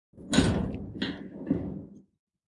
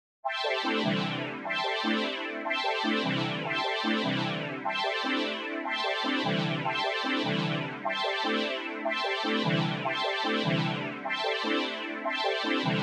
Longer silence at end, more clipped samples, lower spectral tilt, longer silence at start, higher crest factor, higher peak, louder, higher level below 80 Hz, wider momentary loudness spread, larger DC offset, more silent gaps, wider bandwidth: first, 0.45 s vs 0 s; neither; about the same, -5 dB/octave vs -5 dB/octave; about the same, 0.15 s vs 0.25 s; first, 22 dB vs 16 dB; first, -8 dBFS vs -14 dBFS; about the same, -30 LUFS vs -29 LUFS; first, -46 dBFS vs -90 dBFS; first, 15 LU vs 4 LU; neither; neither; about the same, 11.5 kHz vs 11.5 kHz